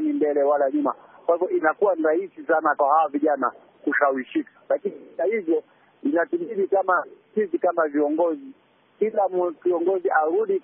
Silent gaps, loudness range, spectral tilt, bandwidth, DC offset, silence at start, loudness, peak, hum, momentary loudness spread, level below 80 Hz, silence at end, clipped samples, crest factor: none; 3 LU; 1 dB/octave; 3.6 kHz; under 0.1%; 0 s; -23 LUFS; -6 dBFS; none; 7 LU; -86 dBFS; 0.05 s; under 0.1%; 16 dB